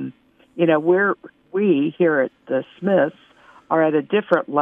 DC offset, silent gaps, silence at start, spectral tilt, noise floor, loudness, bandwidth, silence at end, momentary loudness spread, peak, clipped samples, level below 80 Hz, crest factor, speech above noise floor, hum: under 0.1%; none; 0 s; -9 dB/octave; -43 dBFS; -20 LUFS; 3.7 kHz; 0 s; 9 LU; -2 dBFS; under 0.1%; -72 dBFS; 16 dB; 24 dB; none